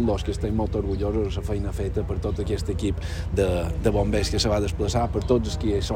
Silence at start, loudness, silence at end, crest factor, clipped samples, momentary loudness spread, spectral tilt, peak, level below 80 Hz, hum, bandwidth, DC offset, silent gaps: 0 s; -25 LUFS; 0 s; 18 dB; under 0.1%; 5 LU; -6 dB/octave; -6 dBFS; -32 dBFS; none; 16 kHz; under 0.1%; none